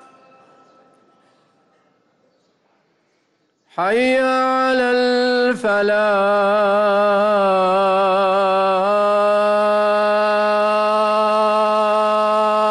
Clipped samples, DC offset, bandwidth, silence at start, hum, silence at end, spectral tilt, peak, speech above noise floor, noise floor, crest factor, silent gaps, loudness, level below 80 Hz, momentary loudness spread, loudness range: under 0.1%; under 0.1%; 11.5 kHz; 3.75 s; none; 0 s; -5 dB/octave; -8 dBFS; 49 dB; -65 dBFS; 8 dB; none; -16 LUFS; -62 dBFS; 1 LU; 5 LU